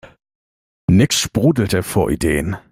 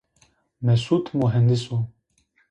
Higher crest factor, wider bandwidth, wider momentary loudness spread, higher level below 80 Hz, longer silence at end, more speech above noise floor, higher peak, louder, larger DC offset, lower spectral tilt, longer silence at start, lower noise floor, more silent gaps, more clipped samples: about the same, 16 dB vs 16 dB; first, 16.5 kHz vs 9.4 kHz; second, 6 LU vs 9 LU; first, -38 dBFS vs -54 dBFS; second, 0.15 s vs 0.6 s; first, over 73 dB vs 45 dB; first, -2 dBFS vs -8 dBFS; first, -17 LUFS vs -22 LUFS; neither; second, -5 dB/octave vs -8 dB/octave; second, 0.05 s vs 0.6 s; first, under -90 dBFS vs -66 dBFS; first, 0.35-0.88 s vs none; neither